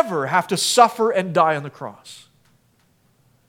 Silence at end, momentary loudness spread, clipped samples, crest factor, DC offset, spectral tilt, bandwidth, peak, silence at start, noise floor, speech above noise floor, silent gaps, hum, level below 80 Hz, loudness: 1.3 s; 20 LU; under 0.1%; 20 dB; under 0.1%; -3.5 dB/octave; 18 kHz; 0 dBFS; 0 s; -61 dBFS; 41 dB; none; none; -74 dBFS; -18 LUFS